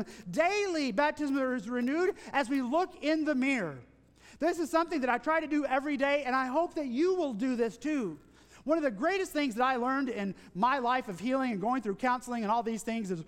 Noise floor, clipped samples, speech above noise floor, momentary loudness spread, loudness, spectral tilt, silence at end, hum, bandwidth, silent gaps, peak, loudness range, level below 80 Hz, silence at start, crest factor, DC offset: -58 dBFS; under 0.1%; 27 dB; 5 LU; -31 LUFS; -5 dB/octave; 0.05 s; none; 16 kHz; none; -14 dBFS; 2 LU; -64 dBFS; 0 s; 16 dB; under 0.1%